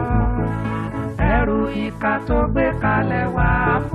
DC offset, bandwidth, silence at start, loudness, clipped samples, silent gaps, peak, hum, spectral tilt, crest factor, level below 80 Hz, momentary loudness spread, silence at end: under 0.1%; 5 kHz; 0 s; -20 LUFS; under 0.1%; none; -4 dBFS; none; -9 dB/octave; 14 dB; -26 dBFS; 6 LU; 0 s